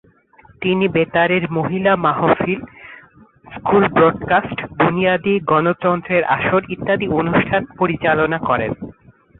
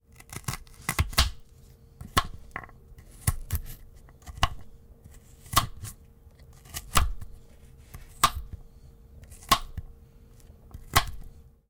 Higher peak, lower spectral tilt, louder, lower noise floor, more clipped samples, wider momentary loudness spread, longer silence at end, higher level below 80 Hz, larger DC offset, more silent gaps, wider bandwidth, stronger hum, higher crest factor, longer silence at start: first, -2 dBFS vs -10 dBFS; first, -11.5 dB/octave vs -2.5 dB/octave; first, -17 LUFS vs -29 LUFS; second, -49 dBFS vs -53 dBFS; neither; second, 9 LU vs 23 LU; first, 0.5 s vs 0.3 s; second, -48 dBFS vs -38 dBFS; neither; neither; second, 4.1 kHz vs 18 kHz; neither; second, 16 dB vs 22 dB; first, 0.6 s vs 0.3 s